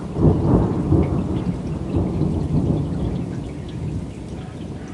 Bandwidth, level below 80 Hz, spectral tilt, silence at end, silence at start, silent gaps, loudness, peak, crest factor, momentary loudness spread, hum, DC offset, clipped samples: 11 kHz; -32 dBFS; -9.5 dB/octave; 0 s; 0 s; none; -22 LUFS; -2 dBFS; 18 dB; 14 LU; none; under 0.1%; under 0.1%